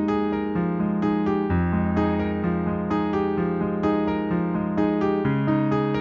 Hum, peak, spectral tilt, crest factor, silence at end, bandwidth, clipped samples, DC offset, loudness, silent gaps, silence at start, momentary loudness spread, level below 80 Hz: none; -10 dBFS; -9.5 dB/octave; 12 dB; 0 s; 6.4 kHz; under 0.1%; under 0.1%; -24 LUFS; none; 0 s; 3 LU; -44 dBFS